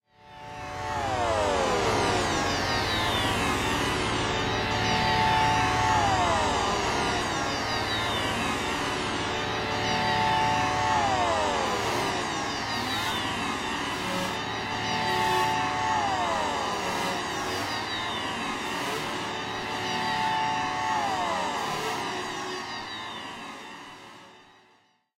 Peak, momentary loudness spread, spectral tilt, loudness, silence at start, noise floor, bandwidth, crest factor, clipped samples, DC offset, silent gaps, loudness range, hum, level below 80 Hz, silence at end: -12 dBFS; 9 LU; -3.5 dB/octave; -27 LUFS; 0.25 s; -64 dBFS; 16 kHz; 16 dB; under 0.1%; under 0.1%; none; 5 LU; none; -46 dBFS; 0.8 s